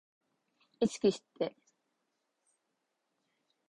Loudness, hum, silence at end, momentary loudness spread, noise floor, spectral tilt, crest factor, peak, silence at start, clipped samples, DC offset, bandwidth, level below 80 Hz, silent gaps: -34 LUFS; none; 2.2 s; 9 LU; -83 dBFS; -5.5 dB/octave; 22 dB; -16 dBFS; 0.8 s; under 0.1%; under 0.1%; 11 kHz; -74 dBFS; none